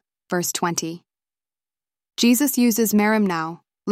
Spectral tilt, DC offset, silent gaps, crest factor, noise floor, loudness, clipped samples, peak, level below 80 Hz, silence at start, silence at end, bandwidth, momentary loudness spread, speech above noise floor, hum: -4 dB/octave; under 0.1%; none; 16 dB; under -90 dBFS; -20 LUFS; under 0.1%; -6 dBFS; -66 dBFS; 0.3 s; 0 s; 16.5 kHz; 15 LU; over 70 dB; none